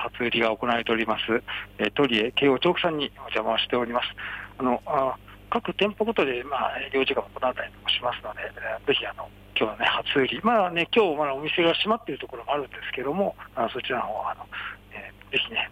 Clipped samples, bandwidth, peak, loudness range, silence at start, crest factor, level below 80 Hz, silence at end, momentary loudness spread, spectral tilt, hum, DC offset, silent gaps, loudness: under 0.1%; 15.5 kHz; -10 dBFS; 4 LU; 0 s; 16 dB; -54 dBFS; 0 s; 12 LU; -6 dB/octave; 50 Hz at -50 dBFS; under 0.1%; none; -26 LUFS